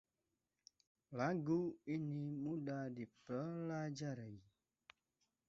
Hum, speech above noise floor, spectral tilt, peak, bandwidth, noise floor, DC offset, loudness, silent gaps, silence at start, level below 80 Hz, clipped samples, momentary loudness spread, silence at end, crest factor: none; over 47 dB; -7.5 dB/octave; -24 dBFS; 7.6 kHz; under -90 dBFS; under 0.1%; -44 LUFS; none; 1.1 s; -80 dBFS; under 0.1%; 12 LU; 1.05 s; 20 dB